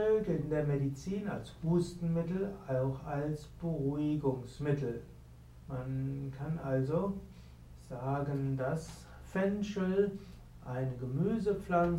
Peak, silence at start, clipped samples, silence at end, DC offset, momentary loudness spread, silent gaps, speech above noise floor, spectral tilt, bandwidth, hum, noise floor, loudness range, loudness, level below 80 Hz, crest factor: -18 dBFS; 0 s; under 0.1%; 0 s; under 0.1%; 16 LU; none; 20 dB; -8.5 dB/octave; 13 kHz; none; -54 dBFS; 3 LU; -35 LUFS; -54 dBFS; 18 dB